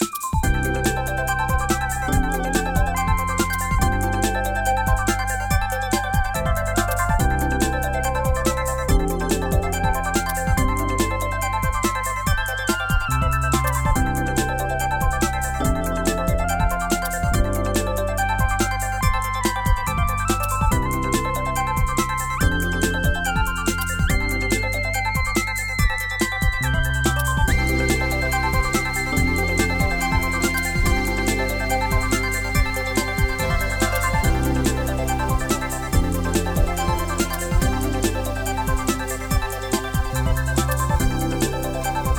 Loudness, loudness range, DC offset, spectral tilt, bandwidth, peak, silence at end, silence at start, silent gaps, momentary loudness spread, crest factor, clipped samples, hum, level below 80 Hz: -22 LUFS; 2 LU; under 0.1%; -4.5 dB/octave; 20 kHz; -4 dBFS; 0 s; 0 s; none; 3 LU; 16 dB; under 0.1%; none; -26 dBFS